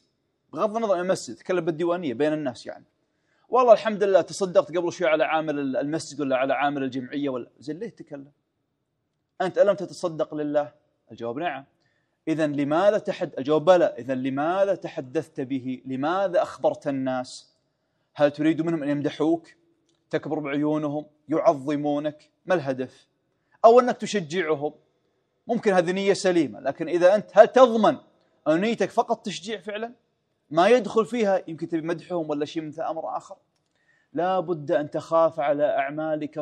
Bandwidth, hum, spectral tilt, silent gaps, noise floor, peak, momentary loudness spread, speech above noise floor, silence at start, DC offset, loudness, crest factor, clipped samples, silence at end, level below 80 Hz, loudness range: 10.5 kHz; none; -5.5 dB/octave; none; -77 dBFS; 0 dBFS; 13 LU; 53 dB; 0.55 s; under 0.1%; -24 LUFS; 24 dB; under 0.1%; 0 s; -78 dBFS; 7 LU